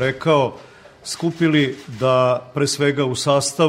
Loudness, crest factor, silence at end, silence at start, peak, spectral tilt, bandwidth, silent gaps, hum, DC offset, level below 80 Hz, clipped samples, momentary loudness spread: -19 LUFS; 16 dB; 0 s; 0 s; -4 dBFS; -5 dB/octave; 16 kHz; none; none; under 0.1%; -56 dBFS; under 0.1%; 7 LU